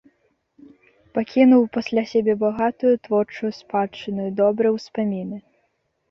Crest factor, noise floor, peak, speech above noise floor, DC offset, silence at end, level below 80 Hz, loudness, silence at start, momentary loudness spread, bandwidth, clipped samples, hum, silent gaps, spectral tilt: 18 dB; -70 dBFS; -4 dBFS; 50 dB; under 0.1%; 0.7 s; -62 dBFS; -21 LUFS; 1.15 s; 13 LU; 6.6 kHz; under 0.1%; none; none; -7.5 dB/octave